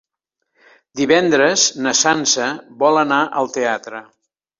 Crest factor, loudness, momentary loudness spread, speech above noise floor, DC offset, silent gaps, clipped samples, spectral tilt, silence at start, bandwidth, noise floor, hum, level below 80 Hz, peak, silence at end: 16 dB; -16 LUFS; 12 LU; 61 dB; under 0.1%; none; under 0.1%; -2 dB/octave; 0.95 s; 7.8 kHz; -78 dBFS; none; -62 dBFS; -2 dBFS; 0.55 s